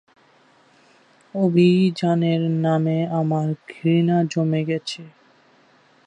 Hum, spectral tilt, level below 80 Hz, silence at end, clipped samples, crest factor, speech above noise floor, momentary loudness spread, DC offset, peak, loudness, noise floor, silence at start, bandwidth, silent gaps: none; -7.5 dB/octave; -68 dBFS; 1 s; under 0.1%; 16 dB; 36 dB; 10 LU; under 0.1%; -6 dBFS; -20 LUFS; -56 dBFS; 1.35 s; 9.4 kHz; none